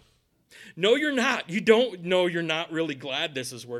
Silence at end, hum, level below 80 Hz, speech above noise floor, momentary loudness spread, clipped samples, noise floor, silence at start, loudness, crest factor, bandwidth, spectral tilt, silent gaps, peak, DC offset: 0 s; none; -70 dBFS; 40 dB; 8 LU; under 0.1%; -65 dBFS; 0.55 s; -25 LUFS; 22 dB; 13.5 kHz; -4 dB/octave; none; -4 dBFS; under 0.1%